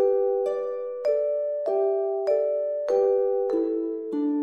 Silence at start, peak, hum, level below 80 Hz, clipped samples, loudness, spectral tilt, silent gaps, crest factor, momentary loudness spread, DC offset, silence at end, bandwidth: 0 s; -12 dBFS; none; -76 dBFS; under 0.1%; -25 LUFS; -6.5 dB/octave; none; 12 dB; 6 LU; under 0.1%; 0 s; 6.8 kHz